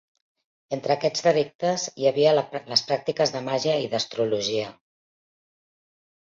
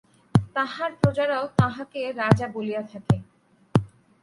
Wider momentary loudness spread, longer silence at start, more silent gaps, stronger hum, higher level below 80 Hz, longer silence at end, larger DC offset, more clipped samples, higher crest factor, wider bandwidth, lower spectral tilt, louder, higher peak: second, 6 LU vs 9 LU; first, 0.7 s vs 0.35 s; first, 1.55-1.59 s vs none; neither; second, -68 dBFS vs -48 dBFS; first, 1.55 s vs 0.35 s; neither; neither; about the same, 20 dB vs 22 dB; second, 7.6 kHz vs 11.5 kHz; second, -4 dB/octave vs -7.5 dB/octave; about the same, -24 LUFS vs -25 LUFS; second, -6 dBFS vs -2 dBFS